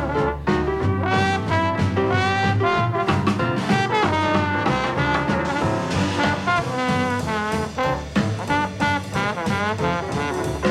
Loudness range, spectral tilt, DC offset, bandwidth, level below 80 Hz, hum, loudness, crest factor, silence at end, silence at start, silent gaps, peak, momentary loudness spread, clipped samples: 3 LU; -6 dB/octave; under 0.1%; 14 kHz; -42 dBFS; none; -21 LUFS; 16 dB; 0 s; 0 s; none; -6 dBFS; 4 LU; under 0.1%